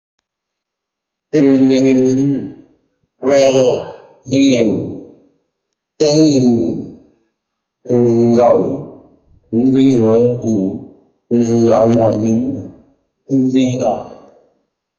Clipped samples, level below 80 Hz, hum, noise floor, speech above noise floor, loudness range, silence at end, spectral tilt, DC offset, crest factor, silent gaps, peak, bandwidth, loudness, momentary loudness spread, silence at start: under 0.1%; -52 dBFS; none; -80 dBFS; 68 dB; 2 LU; 0.85 s; -6.5 dB/octave; under 0.1%; 14 dB; none; 0 dBFS; 7.4 kHz; -13 LUFS; 15 LU; 1.35 s